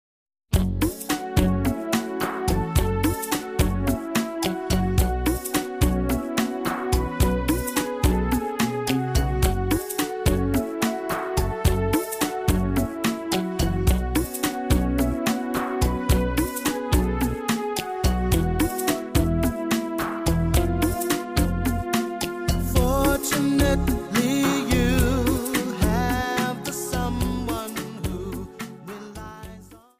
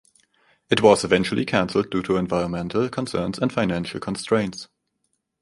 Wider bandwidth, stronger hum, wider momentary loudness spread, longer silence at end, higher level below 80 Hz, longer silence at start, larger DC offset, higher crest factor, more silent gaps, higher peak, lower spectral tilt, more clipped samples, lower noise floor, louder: first, 15.5 kHz vs 11.5 kHz; neither; second, 6 LU vs 11 LU; second, 0.2 s vs 0.75 s; first, -30 dBFS vs -50 dBFS; second, 0.5 s vs 0.7 s; neither; second, 16 dB vs 22 dB; neither; second, -6 dBFS vs -2 dBFS; about the same, -5.5 dB/octave vs -5.5 dB/octave; neither; second, -45 dBFS vs -74 dBFS; about the same, -24 LUFS vs -22 LUFS